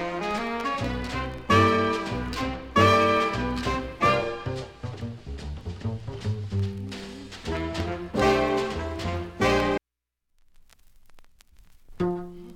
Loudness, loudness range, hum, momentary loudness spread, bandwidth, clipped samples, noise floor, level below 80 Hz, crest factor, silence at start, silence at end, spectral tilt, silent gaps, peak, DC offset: -26 LUFS; 9 LU; none; 16 LU; 16 kHz; under 0.1%; -83 dBFS; -42 dBFS; 20 dB; 0 s; 0 s; -6 dB/octave; none; -8 dBFS; under 0.1%